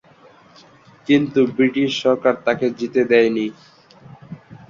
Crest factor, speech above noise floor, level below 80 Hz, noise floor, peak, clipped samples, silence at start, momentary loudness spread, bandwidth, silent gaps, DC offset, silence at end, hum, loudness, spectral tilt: 18 dB; 32 dB; -62 dBFS; -49 dBFS; -2 dBFS; under 0.1%; 1.1 s; 20 LU; 7.6 kHz; none; under 0.1%; 0.15 s; none; -18 LUFS; -6 dB/octave